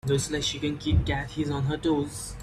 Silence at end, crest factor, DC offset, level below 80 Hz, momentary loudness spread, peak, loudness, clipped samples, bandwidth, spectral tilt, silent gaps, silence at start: 0 s; 16 dB; under 0.1%; -38 dBFS; 4 LU; -12 dBFS; -28 LUFS; under 0.1%; 14 kHz; -5 dB/octave; none; 0.05 s